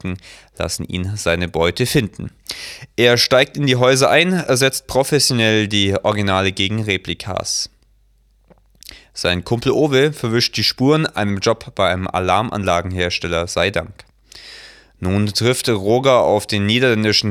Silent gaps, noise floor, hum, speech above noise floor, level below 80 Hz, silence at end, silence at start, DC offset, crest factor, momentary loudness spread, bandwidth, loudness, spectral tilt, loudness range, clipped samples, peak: none; -56 dBFS; none; 39 dB; -44 dBFS; 0 s; 0.05 s; under 0.1%; 18 dB; 13 LU; 17.5 kHz; -17 LUFS; -4 dB/octave; 6 LU; under 0.1%; 0 dBFS